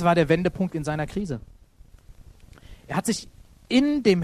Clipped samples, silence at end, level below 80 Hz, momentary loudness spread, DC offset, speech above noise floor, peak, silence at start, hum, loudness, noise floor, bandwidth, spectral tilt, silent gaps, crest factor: under 0.1%; 0 s; -48 dBFS; 11 LU; under 0.1%; 28 dB; -6 dBFS; 0 s; none; -25 LUFS; -51 dBFS; 13.5 kHz; -6 dB/octave; none; 18 dB